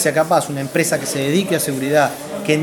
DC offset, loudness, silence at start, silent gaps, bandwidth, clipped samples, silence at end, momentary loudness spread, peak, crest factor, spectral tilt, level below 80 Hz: under 0.1%; -18 LUFS; 0 s; none; 19 kHz; under 0.1%; 0 s; 4 LU; -2 dBFS; 16 dB; -4.5 dB/octave; -60 dBFS